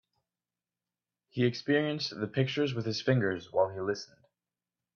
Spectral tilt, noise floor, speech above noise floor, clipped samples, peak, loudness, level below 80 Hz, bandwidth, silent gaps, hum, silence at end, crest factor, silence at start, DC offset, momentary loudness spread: -6 dB/octave; under -90 dBFS; over 60 dB; under 0.1%; -12 dBFS; -31 LUFS; -72 dBFS; 7 kHz; none; none; 0.9 s; 20 dB; 1.35 s; under 0.1%; 7 LU